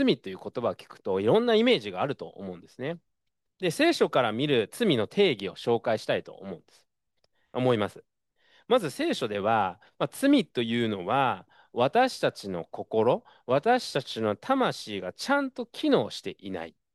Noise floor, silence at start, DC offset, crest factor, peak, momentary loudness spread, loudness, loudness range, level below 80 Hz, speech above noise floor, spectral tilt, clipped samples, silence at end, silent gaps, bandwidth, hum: -84 dBFS; 0 s; under 0.1%; 18 dB; -10 dBFS; 14 LU; -27 LUFS; 3 LU; -74 dBFS; 57 dB; -5.5 dB/octave; under 0.1%; 0.25 s; none; 12.5 kHz; none